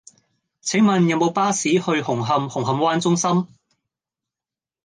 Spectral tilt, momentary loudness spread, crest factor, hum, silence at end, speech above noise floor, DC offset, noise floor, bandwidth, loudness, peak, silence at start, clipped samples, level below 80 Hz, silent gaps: -5 dB/octave; 6 LU; 16 dB; none; 1.4 s; over 71 dB; under 0.1%; under -90 dBFS; 10 kHz; -20 LUFS; -6 dBFS; 0.65 s; under 0.1%; -66 dBFS; none